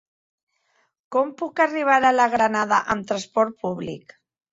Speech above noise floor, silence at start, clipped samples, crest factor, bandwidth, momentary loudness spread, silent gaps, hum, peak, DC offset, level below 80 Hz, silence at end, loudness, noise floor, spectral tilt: 46 dB; 1.1 s; under 0.1%; 18 dB; 8 kHz; 12 LU; none; none; -4 dBFS; under 0.1%; -60 dBFS; 0.55 s; -21 LUFS; -68 dBFS; -4.5 dB/octave